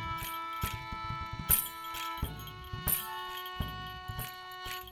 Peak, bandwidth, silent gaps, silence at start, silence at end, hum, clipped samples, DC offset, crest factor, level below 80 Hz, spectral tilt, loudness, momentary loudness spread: -8 dBFS; over 20 kHz; none; 0 s; 0 s; none; under 0.1%; under 0.1%; 28 dB; -48 dBFS; -2.5 dB/octave; -35 LUFS; 13 LU